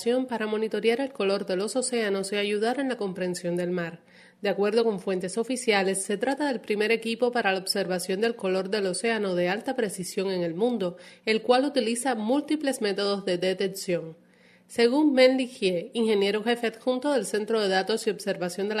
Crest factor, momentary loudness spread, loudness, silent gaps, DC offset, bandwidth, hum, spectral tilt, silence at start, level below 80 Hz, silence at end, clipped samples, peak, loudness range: 20 dB; 7 LU; -26 LUFS; none; under 0.1%; 13.5 kHz; none; -4 dB/octave; 0 s; -76 dBFS; 0 s; under 0.1%; -6 dBFS; 3 LU